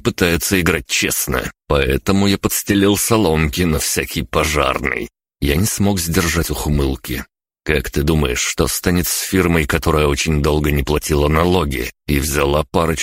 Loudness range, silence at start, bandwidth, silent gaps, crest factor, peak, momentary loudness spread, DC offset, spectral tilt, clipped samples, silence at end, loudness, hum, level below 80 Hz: 2 LU; 0.05 s; 16.5 kHz; none; 16 dB; -2 dBFS; 6 LU; under 0.1%; -4.5 dB/octave; under 0.1%; 0 s; -17 LUFS; none; -28 dBFS